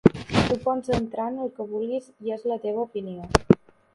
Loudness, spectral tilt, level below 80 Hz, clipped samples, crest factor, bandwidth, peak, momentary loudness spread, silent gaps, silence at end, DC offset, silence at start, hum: -26 LUFS; -6.5 dB/octave; -42 dBFS; under 0.1%; 24 dB; 11.5 kHz; 0 dBFS; 10 LU; none; 0.4 s; under 0.1%; 0.05 s; none